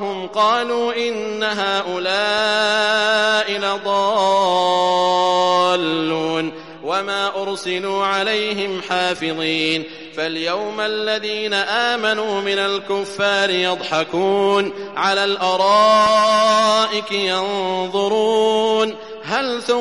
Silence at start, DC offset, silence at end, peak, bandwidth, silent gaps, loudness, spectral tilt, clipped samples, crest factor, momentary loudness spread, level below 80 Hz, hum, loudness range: 0 s; 0.2%; 0 s; -4 dBFS; 11.5 kHz; none; -18 LUFS; -3 dB/octave; under 0.1%; 14 dB; 8 LU; -62 dBFS; none; 5 LU